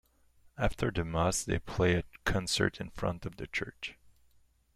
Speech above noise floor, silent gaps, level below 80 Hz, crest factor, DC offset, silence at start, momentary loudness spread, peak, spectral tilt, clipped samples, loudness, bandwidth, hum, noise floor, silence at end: 34 dB; none; -46 dBFS; 22 dB; under 0.1%; 0.55 s; 9 LU; -12 dBFS; -4.5 dB/octave; under 0.1%; -33 LUFS; 15.5 kHz; none; -66 dBFS; 0.85 s